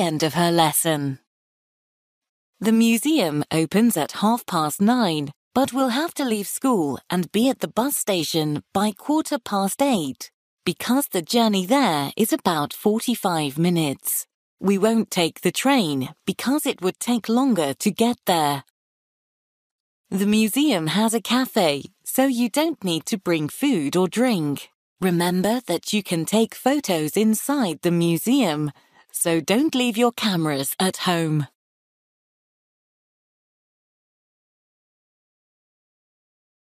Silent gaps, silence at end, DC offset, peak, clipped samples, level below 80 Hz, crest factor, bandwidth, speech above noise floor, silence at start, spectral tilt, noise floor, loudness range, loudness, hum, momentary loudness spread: 1.27-2.21 s, 2.29-2.53 s, 5.36-5.51 s, 10.34-10.57 s, 14.34-14.57 s, 18.70-20.04 s, 24.75-24.96 s; 5.15 s; under 0.1%; -4 dBFS; under 0.1%; -66 dBFS; 18 dB; 15.5 kHz; over 69 dB; 0 s; -4.5 dB/octave; under -90 dBFS; 2 LU; -22 LUFS; none; 7 LU